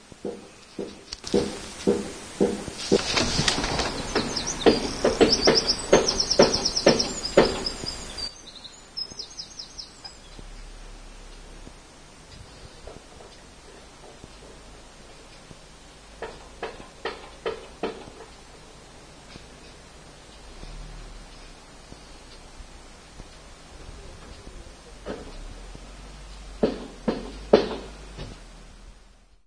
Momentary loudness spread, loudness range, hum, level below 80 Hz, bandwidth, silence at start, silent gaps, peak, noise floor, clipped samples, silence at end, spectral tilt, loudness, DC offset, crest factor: 26 LU; 25 LU; none; -44 dBFS; 11 kHz; 0.25 s; none; 0 dBFS; -54 dBFS; under 0.1%; 0.55 s; -3.5 dB/octave; -25 LUFS; under 0.1%; 28 dB